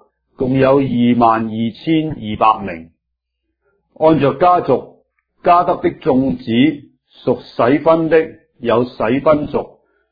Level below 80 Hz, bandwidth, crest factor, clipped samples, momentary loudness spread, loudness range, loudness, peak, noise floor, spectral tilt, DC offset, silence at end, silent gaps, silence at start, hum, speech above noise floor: -46 dBFS; 5 kHz; 16 dB; under 0.1%; 11 LU; 2 LU; -15 LUFS; 0 dBFS; -75 dBFS; -10 dB/octave; under 0.1%; 0.45 s; none; 0.4 s; none; 61 dB